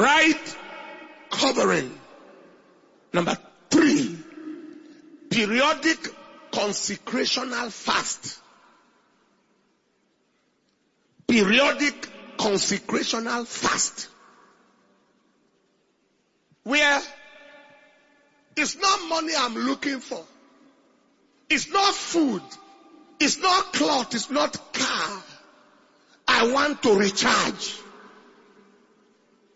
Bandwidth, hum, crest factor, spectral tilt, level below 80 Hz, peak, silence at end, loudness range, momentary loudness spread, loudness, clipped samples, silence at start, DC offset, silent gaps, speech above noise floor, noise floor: 8 kHz; none; 24 dB; -2.5 dB/octave; -64 dBFS; -4 dBFS; 1.5 s; 5 LU; 19 LU; -23 LUFS; under 0.1%; 0 s; under 0.1%; none; 45 dB; -68 dBFS